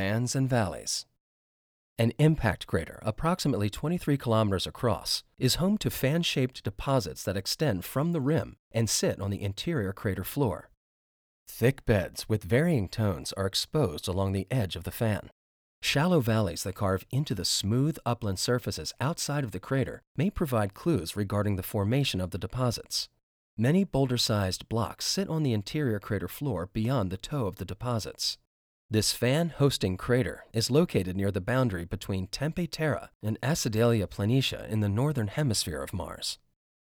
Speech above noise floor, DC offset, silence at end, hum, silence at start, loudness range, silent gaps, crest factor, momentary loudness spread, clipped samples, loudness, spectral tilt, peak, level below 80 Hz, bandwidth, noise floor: over 62 dB; under 0.1%; 0.45 s; none; 0 s; 3 LU; 1.20-1.96 s, 8.59-8.71 s, 10.77-11.46 s, 15.32-15.82 s, 20.07-20.15 s, 23.23-23.57 s, 28.47-28.89 s, 33.15-33.20 s; 18 dB; 7 LU; under 0.1%; -29 LUFS; -5 dB/octave; -10 dBFS; -50 dBFS; over 20 kHz; under -90 dBFS